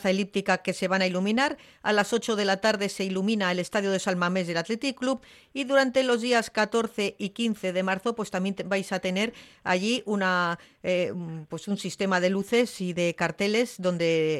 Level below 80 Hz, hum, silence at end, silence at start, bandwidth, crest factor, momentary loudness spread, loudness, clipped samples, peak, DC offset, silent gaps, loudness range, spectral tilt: -68 dBFS; none; 0 s; 0 s; 13.5 kHz; 16 dB; 6 LU; -27 LUFS; under 0.1%; -10 dBFS; under 0.1%; none; 2 LU; -4.5 dB/octave